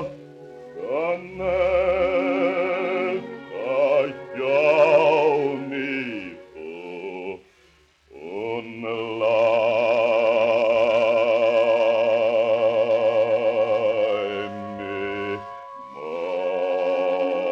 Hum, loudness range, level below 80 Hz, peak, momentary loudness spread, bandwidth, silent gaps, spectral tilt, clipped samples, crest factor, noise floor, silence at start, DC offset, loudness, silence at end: none; 7 LU; -56 dBFS; -6 dBFS; 16 LU; 7.2 kHz; none; -6 dB/octave; under 0.1%; 16 dB; -58 dBFS; 0 s; under 0.1%; -22 LUFS; 0 s